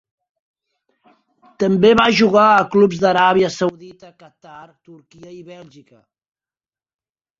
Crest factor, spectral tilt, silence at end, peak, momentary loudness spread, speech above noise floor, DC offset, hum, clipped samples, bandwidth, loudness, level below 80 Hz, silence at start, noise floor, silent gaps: 18 dB; -5.5 dB/octave; 1.85 s; -2 dBFS; 10 LU; over 73 dB; under 0.1%; none; under 0.1%; 7.6 kHz; -14 LUFS; -54 dBFS; 1.6 s; under -90 dBFS; none